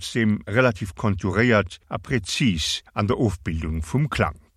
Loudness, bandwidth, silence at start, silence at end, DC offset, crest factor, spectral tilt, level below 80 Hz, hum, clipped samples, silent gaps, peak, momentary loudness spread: -23 LUFS; 14.5 kHz; 0 s; 0.2 s; under 0.1%; 18 dB; -5.5 dB/octave; -38 dBFS; none; under 0.1%; none; -4 dBFS; 8 LU